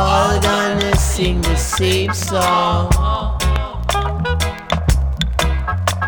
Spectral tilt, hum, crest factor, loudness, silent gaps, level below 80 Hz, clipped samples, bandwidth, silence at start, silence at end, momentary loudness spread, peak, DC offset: -4.5 dB/octave; none; 14 dB; -17 LUFS; none; -20 dBFS; under 0.1%; over 20 kHz; 0 s; 0 s; 5 LU; -2 dBFS; under 0.1%